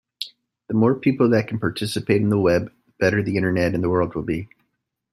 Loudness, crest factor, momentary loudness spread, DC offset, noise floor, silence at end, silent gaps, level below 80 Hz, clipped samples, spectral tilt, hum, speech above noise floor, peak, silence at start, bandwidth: -21 LUFS; 18 dB; 14 LU; under 0.1%; -75 dBFS; 0.65 s; none; -52 dBFS; under 0.1%; -7 dB/octave; none; 55 dB; -4 dBFS; 0.2 s; 13 kHz